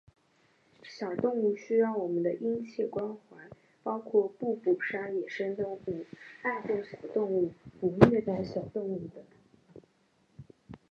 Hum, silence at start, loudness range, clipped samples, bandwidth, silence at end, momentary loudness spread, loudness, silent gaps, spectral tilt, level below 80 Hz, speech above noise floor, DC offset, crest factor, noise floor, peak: none; 0.85 s; 3 LU; under 0.1%; 7.6 kHz; 0.15 s; 12 LU; -31 LUFS; none; -8.5 dB/octave; -62 dBFS; 39 dB; under 0.1%; 30 dB; -69 dBFS; -2 dBFS